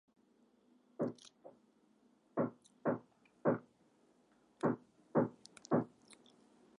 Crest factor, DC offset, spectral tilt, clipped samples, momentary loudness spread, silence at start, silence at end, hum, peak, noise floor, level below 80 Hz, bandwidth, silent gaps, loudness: 22 dB; under 0.1%; -8 dB/octave; under 0.1%; 11 LU; 1 s; 0.65 s; none; -20 dBFS; -72 dBFS; -84 dBFS; 11 kHz; none; -40 LUFS